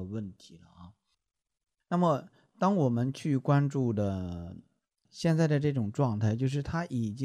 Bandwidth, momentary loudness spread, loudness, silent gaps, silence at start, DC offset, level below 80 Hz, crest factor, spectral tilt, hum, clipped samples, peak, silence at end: 10.5 kHz; 12 LU; -30 LUFS; none; 0 s; under 0.1%; -58 dBFS; 18 dB; -8 dB/octave; none; under 0.1%; -12 dBFS; 0 s